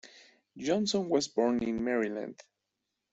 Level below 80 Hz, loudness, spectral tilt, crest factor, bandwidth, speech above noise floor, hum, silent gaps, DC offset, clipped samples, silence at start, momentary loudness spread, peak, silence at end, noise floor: -66 dBFS; -31 LUFS; -4.5 dB/octave; 18 dB; 8.2 kHz; 55 dB; none; none; under 0.1%; under 0.1%; 0.05 s; 10 LU; -14 dBFS; 0.8 s; -85 dBFS